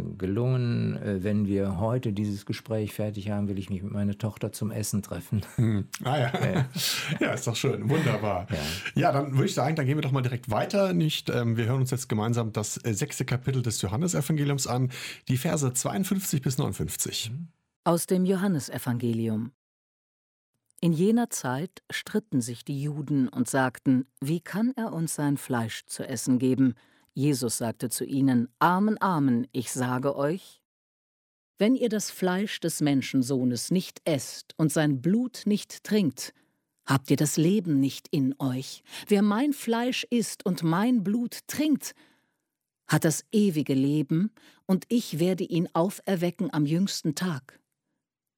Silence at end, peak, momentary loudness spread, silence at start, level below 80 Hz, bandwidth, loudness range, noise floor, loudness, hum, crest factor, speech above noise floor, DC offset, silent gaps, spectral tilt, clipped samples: 0.95 s; -10 dBFS; 7 LU; 0 s; -60 dBFS; 17.5 kHz; 3 LU; -84 dBFS; -27 LUFS; none; 18 dB; 58 dB; under 0.1%; 17.76-17.83 s, 19.54-20.53 s, 30.65-31.54 s; -5.5 dB/octave; under 0.1%